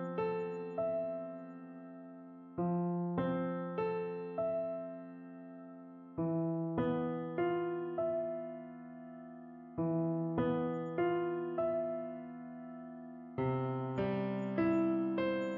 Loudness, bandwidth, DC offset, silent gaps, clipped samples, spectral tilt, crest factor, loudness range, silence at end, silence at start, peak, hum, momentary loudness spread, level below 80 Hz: -37 LUFS; 5.2 kHz; under 0.1%; none; under 0.1%; -7.5 dB/octave; 16 dB; 2 LU; 0 s; 0 s; -20 dBFS; none; 16 LU; -72 dBFS